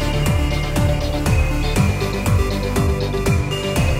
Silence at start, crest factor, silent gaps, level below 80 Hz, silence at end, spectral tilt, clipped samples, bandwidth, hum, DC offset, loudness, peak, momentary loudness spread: 0 s; 14 dB; none; -22 dBFS; 0 s; -5.5 dB/octave; under 0.1%; 16 kHz; none; under 0.1%; -19 LUFS; -4 dBFS; 2 LU